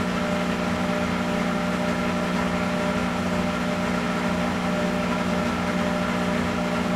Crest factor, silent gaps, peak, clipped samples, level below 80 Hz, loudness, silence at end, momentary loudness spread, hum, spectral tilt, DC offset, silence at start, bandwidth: 14 dB; none; -10 dBFS; under 0.1%; -44 dBFS; -24 LUFS; 0 s; 1 LU; 60 Hz at -30 dBFS; -5.5 dB/octave; under 0.1%; 0 s; 15 kHz